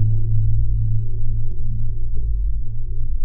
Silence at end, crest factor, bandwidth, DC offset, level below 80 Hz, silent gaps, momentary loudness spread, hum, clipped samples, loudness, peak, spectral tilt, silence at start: 0 s; 8 dB; 0.5 kHz; under 0.1%; -20 dBFS; none; 8 LU; none; under 0.1%; -25 LUFS; -6 dBFS; -13.5 dB/octave; 0 s